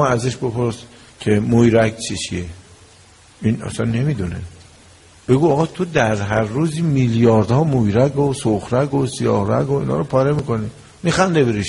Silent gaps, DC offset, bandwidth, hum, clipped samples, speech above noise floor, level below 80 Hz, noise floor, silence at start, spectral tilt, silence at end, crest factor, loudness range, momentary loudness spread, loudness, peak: none; under 0.1%; 11.5 kHz; none; under 0.1%; 30 dB; -44 dBFS; -47 dBFS; 0 s; -6.5 dB/octave; 0 s; 16 dB; 5 LU; 10 LU; -18 LUFS; -2 dBFS